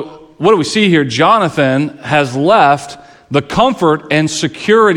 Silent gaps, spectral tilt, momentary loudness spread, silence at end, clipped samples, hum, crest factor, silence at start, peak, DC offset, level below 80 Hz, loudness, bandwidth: none; -5 dB/octave; 8 LU; 0 s; under 0.1%; none; 12 dB; 0 s; 0 dBFS; under 0.1%; -46 dBFS; -12 LUFS; 12 kHz